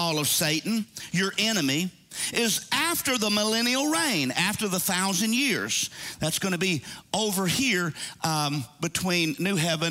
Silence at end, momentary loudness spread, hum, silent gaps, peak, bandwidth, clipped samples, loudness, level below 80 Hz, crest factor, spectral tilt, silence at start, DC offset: 0 s; 7 LU; none; none; -8 dBFS; 16 kHz; under 0.1%; -25 LUFS; -62 dBFS; 18 dB; -3 dB/octave; 0 s; under 0.1%